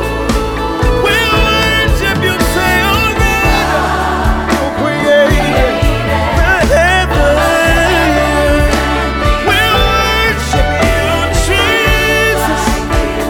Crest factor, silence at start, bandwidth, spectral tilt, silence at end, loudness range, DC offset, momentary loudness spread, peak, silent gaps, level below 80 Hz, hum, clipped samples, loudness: 10 dB; 0 s; 18.5 kHz; -4.5 dB/octave; 0 s; 1 LU; under 0.1%; 4 LU; 0 dBFS; none; -18 dBFS; none; under 0.1%; -11 LUFS